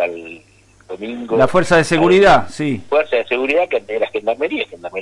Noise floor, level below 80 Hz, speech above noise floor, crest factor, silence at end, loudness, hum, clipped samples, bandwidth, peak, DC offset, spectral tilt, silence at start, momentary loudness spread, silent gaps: -49 dBFS; -44 dBFS; 34 dB; 14 dB; 0 s; -15 LUFS; none; under 0.1%; 11.5 kHz; -2 dBFS; under 0.1%; -5.5 dB/octave; 0 s; 17 LU; none